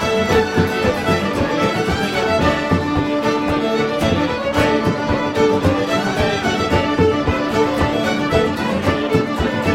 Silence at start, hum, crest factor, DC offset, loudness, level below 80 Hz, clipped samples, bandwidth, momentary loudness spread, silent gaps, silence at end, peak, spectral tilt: 0 s; none; 16 dB; under 0.1%; -17 LUFS; -34 dBFS; under 0.1%; 16.5 kHz; 3 LU; none; 0 s; -2 dBFS; -5.5 dB/octave